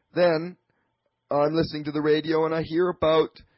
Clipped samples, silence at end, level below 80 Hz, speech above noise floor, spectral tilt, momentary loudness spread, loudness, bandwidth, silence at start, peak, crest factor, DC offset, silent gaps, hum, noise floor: under 0.1%; 0.3 s; -54 dBFS; 51 dB; -10.5 dB/octave; 6 LU; -24 LUFS; 5.8 kHz; 0.15 s; -12 dBFS; 14 dB; under 0.1%; none; none; -75 dBFS